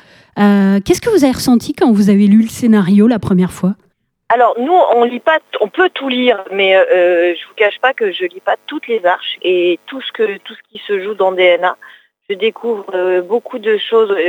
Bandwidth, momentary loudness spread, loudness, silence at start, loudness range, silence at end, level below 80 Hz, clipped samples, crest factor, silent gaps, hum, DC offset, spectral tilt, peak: 15.5 kHz; 9 LU; -13 LUFS; 0.35 s; 5 LU; 0 s; -50 dBFS; under 0.1%; 12 dB; none; none; under 0.1%; -6 dB/octave; 0 dBFS